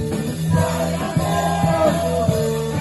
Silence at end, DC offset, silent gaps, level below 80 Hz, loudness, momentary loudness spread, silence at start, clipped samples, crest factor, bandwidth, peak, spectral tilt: 0 s; under 0.1%; none; -40 dBFS; -20 LUFS; 4 LU; 0 s; under 0.1%; 14 dB; 12.5 kHz; -4 dBFS; -6 dB/octave